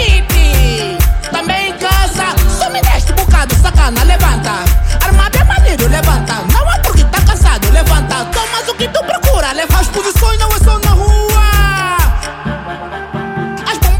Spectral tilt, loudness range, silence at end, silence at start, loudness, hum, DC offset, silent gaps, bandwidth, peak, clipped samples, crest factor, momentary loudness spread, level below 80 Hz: -4.5 dB/octave; 2 LU; 0 s; 0 s; -12 LUFS; none; under 0.1%; none; 17 kHz; 0 dBFS; under 0.1%; 10 dB; 7 LU; -12 dBFS